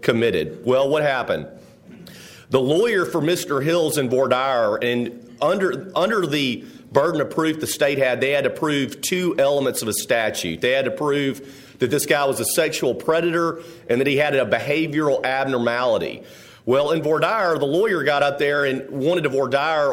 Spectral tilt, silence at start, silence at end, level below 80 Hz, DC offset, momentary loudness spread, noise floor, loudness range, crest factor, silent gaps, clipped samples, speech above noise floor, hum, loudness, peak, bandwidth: -4.5 dB/octave; 0 s; 0 s; -60 dBFS; under 0.1%; 5 LU; -42 dBFS; 1 LU; 18 dB; none; under 0.1%; 22 dB; none; -20 LUFS; -2 dBFS; 16.5 kHz